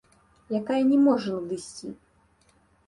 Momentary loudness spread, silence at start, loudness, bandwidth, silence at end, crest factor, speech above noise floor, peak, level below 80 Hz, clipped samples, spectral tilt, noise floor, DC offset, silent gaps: 19 LU; 0.5 s; -25 LUFS; 11 kHz; 0.95 s; 16 dB; 39 dB; -12 dBFS; -66 dBFS; under 0.1%; -6 dB/octave; -63 dBFS; under 0.1%; none